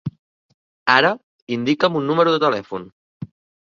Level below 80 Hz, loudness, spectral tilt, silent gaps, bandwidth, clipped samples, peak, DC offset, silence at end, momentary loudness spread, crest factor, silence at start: -62 dBFS; -18 LUFS; -6 dB/octave; 0.19-0.86 s, 1.23-1.47 s, 2.92-3.20 s; 7.2 kHz; under 0.1%; 0 dBFS; under 0.1%; 0.35 s; 22 LU; 20 dB; 0.05 s